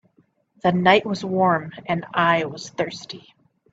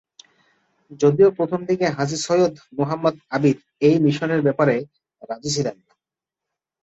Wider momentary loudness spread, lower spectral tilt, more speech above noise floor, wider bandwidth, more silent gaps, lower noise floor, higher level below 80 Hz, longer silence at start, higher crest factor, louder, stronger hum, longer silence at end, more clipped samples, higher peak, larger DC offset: first, 14 LU vs 9 LU; about the same, -5.5 dB/octave vs -6 dB/octave; second, 41 dB vs 68 dB; about the same, 8 kHz vs 8.2 kHz; neither; second, -62 dBFS vs -87 dBFS; about the same, -62 dBFS vs -62 dBFS; second, 0.65 s vs 0.9 s; about the same, 22 dB vs 18 dB; about the same, -21 LUFS vs -20 LUFS; neither; second, 0.55 s vs 1.1 s; neither; about the same, -2 dBFS vs -4 dBFS; neither